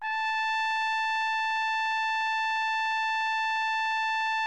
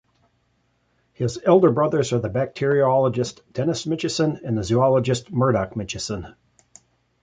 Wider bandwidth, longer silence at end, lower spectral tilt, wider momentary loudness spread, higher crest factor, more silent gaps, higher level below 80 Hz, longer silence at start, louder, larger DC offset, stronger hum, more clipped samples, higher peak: about the same, 9.4 kHz vs 9.4 kHz; second, 0 s vs 0.9 s; second, 4.5 dB/octave vs -6 dB/octave; second, 0 LU vs 11 LU; second, 8 dB vs 20 dB; neither; second, -76 dBFS vs -50 dBFS; second, 0 s vs 1.2 s; second, -27 LUFS vs -21 LUFS; first, 0.2% vs under 0.1%; first, 50 Hz at -80 dBFS vs none; neither; second, -20 dBFS vs -2 dBFS